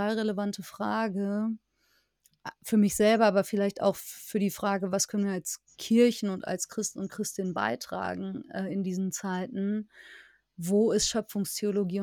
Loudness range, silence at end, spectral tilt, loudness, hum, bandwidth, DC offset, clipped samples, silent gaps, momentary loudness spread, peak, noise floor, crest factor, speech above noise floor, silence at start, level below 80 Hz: 6 LU; 0 s; -4.5 dB/octave; -29 LUFS; none; 19 kHz; under 0.1%; under 0.1%; none; 12 LU; -12 dBFS; -71 dBFS; 18 dB; 43 dB; 0 s; -64 dBFS